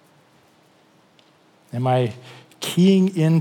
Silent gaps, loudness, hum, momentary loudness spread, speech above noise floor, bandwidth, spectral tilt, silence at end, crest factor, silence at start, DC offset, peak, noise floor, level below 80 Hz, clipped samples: none; -20 LUFS; none; 16 LU; 38 dB; 18.5 kHz; -7 dB/octave; 0 s; 16 dB; 1.75 s; under 0.1%; -6 dBFS; -56 dBFS; -80 dBFS; under 0.1%